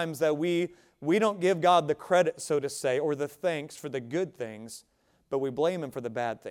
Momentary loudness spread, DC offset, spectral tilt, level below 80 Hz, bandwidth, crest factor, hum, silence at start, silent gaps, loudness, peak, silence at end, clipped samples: 12 LU; under 0.1%; -5 dB/octave; -72 dBFS; 16.5 kHz; 20 dB; none; 0 s; none; -29 LUFS; -10 dBFS; 0 s; under 0.1%